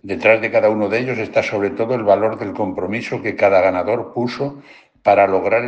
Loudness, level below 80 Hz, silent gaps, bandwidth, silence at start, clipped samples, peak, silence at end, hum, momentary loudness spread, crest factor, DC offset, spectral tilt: -17 LUFS; -62 dBFS; none; 8.2 kHz; 0.05 s; under 0.1%; 0 dBFS; 0 s; none; 9 LU; 16 dB; under 0.1%; -6.5 dB/octave